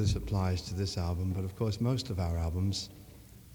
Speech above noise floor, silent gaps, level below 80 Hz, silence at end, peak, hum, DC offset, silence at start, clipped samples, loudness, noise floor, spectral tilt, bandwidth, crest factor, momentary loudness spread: 20 dB; none; -44 dBFS; 0 s; -16 dBFS; none; under 0.1%; 0 s; under 0.1%; -33 LUFS; -52 dBFS; -6 dB/octave; 19.5 kHz; 16 dB; 12 LU